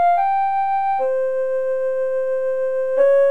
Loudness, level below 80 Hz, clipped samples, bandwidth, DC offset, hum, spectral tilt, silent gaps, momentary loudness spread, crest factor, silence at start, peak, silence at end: -20 LUFS; -66 dBFS; under 0.1%; 4.2 kHz; 2%; none; -4 dB/octave; none; 5 LU; 12 dB; 0 s; -6 dBFS; 0 s